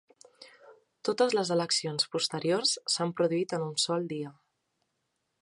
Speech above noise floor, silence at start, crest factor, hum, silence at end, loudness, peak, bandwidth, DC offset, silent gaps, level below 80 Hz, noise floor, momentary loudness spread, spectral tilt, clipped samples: 51 dB; 0.4 s; 20 dB; none; 1.1 s; -29 LUFS; -12 dBFS; 11.5 kHz; under 0.1%; none; -82 dBFS; -80 dBFS; 8 LU; -3.5 dB/octave; under 0.1%